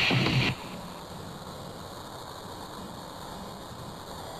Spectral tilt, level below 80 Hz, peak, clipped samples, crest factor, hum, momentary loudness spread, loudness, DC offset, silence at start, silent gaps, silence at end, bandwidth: -4.5 dB/octave; -54 dBFS; -14 dBFS; under 0.1%; 20 dB; none; 16 LU; -34 LUFS; under 0.1%; 0 s; none; 0 s; 15 kHz